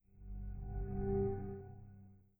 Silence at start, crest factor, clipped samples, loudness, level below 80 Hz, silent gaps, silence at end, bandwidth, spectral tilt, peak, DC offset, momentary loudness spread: 0.15 s; 16 dB; under 0.1%; -42 LUFS; -48 dBFS; none; 0.2 s; 2.7 kHz; -13 dB/octave; -26 dBFS; under 0.1%; 20 LU